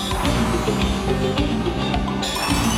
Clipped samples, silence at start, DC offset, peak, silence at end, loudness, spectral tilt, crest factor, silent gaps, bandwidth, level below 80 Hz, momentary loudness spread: under 0.1%; 0 s; under 0.1%; -4 dBFS; 0 s; -21 LUFS; -5 dB/octave; 16 dB; none; 17 kHz; -28 dBFS; 2 LU